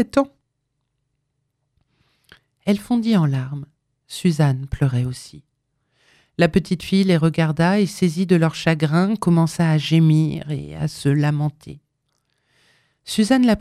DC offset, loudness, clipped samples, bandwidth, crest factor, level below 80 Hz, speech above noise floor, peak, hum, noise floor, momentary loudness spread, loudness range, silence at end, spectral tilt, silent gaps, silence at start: under 0.1%; -19 LUFS; under 0.1%; 13.5 kHz; 18 dB; -48 dBFS; 56 dB; -2 dBFS; none; -74 dBFS; 11 LU; 7 LU; 0 s; -7 dB/octave; none; 0 s